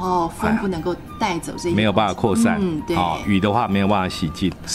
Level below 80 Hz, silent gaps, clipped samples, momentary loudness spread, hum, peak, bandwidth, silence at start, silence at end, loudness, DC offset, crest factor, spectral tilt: -42 dBFS; none; under 0.1%; 6 LU; none; -2 dBFS; 15 kHz; 0 s; 0 s; -20 LUFS; under 0.1%; 18 dB; -5.5 dB/octave